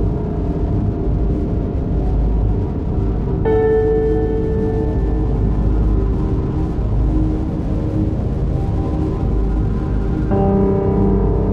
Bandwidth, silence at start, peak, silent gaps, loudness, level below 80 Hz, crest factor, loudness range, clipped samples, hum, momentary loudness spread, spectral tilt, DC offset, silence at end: 4.2 kHz; 0 s; -4 dBFS; none; -18 LUFS; -20 dBFS; 12 dB; 2 LU; under 0.1%; none; 5 LU; -11 dB/octave; under 0.1%; 0 s